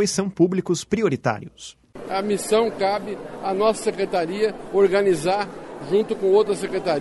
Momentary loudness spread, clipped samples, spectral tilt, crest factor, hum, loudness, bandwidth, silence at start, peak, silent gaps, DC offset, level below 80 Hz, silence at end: 13 LU; under 0.1%; -5 dB/octave; 16 dB; none; -22 LUFS; 11.5 kHz; 0 s; -6 dBFS; none; under 0.1%; -54 dBFS; 0 s